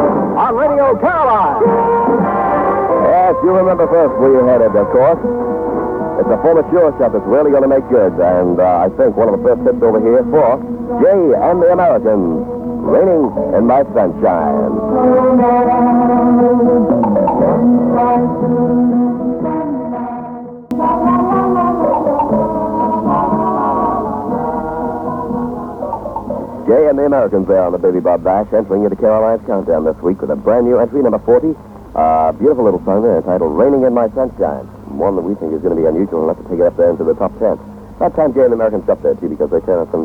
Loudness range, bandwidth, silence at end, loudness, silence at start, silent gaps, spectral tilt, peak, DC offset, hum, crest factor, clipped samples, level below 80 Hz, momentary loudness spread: 4 LU; 3.8 kHz; 0 s; -13 LUFS; 0 s; none; -10.5 dB/octave; 0 dBFS; under 0.1%; none; 12 dB; under 0.1%; -40 dBFS; 8 LU